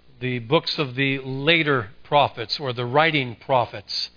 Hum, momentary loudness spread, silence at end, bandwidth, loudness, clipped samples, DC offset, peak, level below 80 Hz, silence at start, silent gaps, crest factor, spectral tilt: none; 8 LU; 0.1 s; 5.4 kHz; -22 LUFS; under 0.1%; under 0.1%; -2 dBFS; -60 dBFS; 0.2 s; none; 20 dB; -6 dB/octave